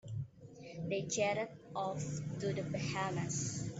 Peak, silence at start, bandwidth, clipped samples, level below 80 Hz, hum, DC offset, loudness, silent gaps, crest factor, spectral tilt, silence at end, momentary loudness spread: -22 dBFS; 0.05 s; 8.2 kHz; under 0.1%; -68 dBFS; none; under 0.1%; -39 LUFS; none; 18 dB; -4.5 dB/octave; 0 s; 11 LU